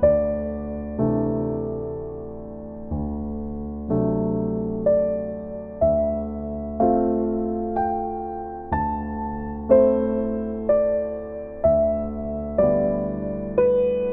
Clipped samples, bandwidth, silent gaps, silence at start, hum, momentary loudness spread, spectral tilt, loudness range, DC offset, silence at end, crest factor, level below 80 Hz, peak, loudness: under 0.1%; 3.4 kHz; none; 0 s; none; 12 LU; -13 dB/octave; 6 LU; under 0.1%; 0 s; 18 dB; -38 dBFS; -4 dBFS; -24 LUFS